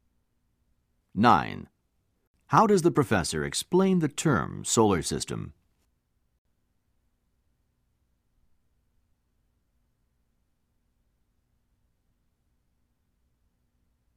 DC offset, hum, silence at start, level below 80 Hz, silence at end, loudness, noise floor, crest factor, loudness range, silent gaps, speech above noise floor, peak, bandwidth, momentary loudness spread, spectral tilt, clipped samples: under 0.1%; 60 Hz at -55 dBFS; 1.15 s; -58 dBFS; 8.65 s; -25 LUFS; -74 dBFS; 24 dB; 8 LU; 2.27-2.34 s; 50 dB; -6 dBFS; 15.5 kHz; 15 LU; -5 dB/octave; under 0.1%